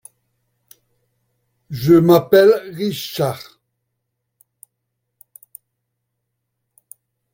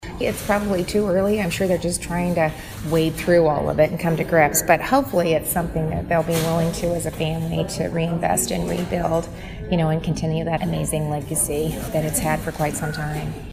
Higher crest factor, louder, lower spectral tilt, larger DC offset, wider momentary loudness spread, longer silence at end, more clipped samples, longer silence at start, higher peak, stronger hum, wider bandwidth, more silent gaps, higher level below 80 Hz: about the same, 20 dB vs 20 dB; first, -15 LUFS vs -21 LUFS; first, -6.5 dB/octave vs -5 dB/octave; neither; first, 14 LU vs 7 LU; first, 3.95 s vs 0 s; neither; first, 1.7 s vs 0 s; about the same, 0 dBFS vs -2 dBFS; neither; about the same, 17 kHz vs 16 kHz; neither; second, -58 dBFS vs -38 dBFS